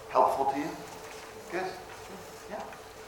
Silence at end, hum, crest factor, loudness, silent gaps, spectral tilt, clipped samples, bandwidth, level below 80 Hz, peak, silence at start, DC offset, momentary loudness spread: 0 s; none; 22 dB; -33 LUFS; none; -4.5 dB/octave; under 0.1%; 18 kHz; -64 dBFS; -10 dBFS; 0 s; under 0.1%; 18 LU